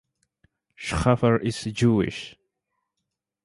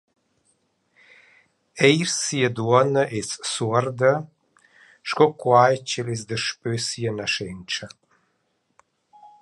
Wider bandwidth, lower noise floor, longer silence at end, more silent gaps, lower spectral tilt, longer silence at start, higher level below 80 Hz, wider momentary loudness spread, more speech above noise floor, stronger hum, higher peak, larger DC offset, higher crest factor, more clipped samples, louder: about the same, 11.5 kHz vs 11.5 kHz; first, -83 dBFS vs -71 dBFS; first, 1.15 s vs 0.15 s; neither; first, -6.5 dB/octave vs -4 dB/octave; second, 0.8 s vs 1.75 s; first, -44 dBFS vs -62 dBFS; about the same, 15 LU vs 13 LU; first, 60 dB vs 49 dB; neither; second, -6 dBFS vs -2 dBFS; neither; about the same, 20 dB vs 22 dB; neither; about the same, -23 LUFS vs -22 LUFS